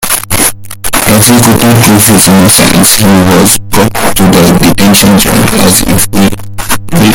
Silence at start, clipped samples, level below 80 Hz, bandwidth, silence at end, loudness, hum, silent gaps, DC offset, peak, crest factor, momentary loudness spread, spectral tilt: 0 s; 10%; -24 dBFS; over 20 kHz; 0 s; -4 LUFS; none; none; under 0.1%; 0 dBFS; 4 dB; 7 LU; -4 dB/octave